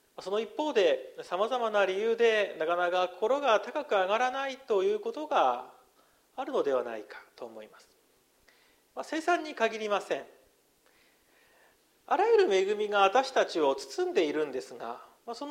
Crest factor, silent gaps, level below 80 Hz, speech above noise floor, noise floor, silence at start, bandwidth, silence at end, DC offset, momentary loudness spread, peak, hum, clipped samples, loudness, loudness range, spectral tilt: 20 dB; none; -80 dBFS; 38 dB; -67 dBFS; 0.2 s; 15.5 kHz; 0 s; under 0.1%; 17 LU; -10 dBFS; none; under 0.1%; -29 LUFS; 7 LU; -3 dB/octave